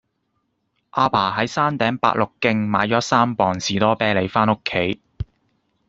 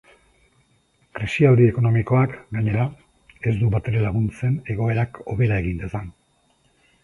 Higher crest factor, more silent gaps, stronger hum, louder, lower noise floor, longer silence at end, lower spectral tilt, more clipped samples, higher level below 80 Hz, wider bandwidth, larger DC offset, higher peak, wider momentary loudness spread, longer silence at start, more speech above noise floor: about the same, 18 dB vs 18 dB; neither; neither; about the same, -19 LUFS vs -21 LUFS; first, -71 dBFS vs -63 dBFS; second, 0.65 s vs 0.9 s; second, -5 dB/octave vs -9 dB/octave; neither; second, -48 dBFS vs -42 dBFS; second, 7.8 kHz vs 10.5 kHz; neither; about the same, -2 dBFS vs -4 dBFS; second, 9 LU vs 13 LU; second, 0.95 s vs 1.15 s; first, 52 dB vs 43 dB